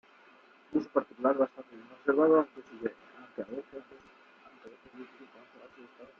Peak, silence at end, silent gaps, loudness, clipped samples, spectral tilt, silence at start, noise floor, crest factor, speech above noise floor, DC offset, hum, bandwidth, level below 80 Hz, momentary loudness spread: -12 dBFS; 0.15 s; none; -31 LUFS; under 0.1%; -5.5 dB/octave; 0.7 s; -60 dBFS; 22 dB; 27 dB; under 0.1%; none; 6 kHz; -78 dBFS; 27 LU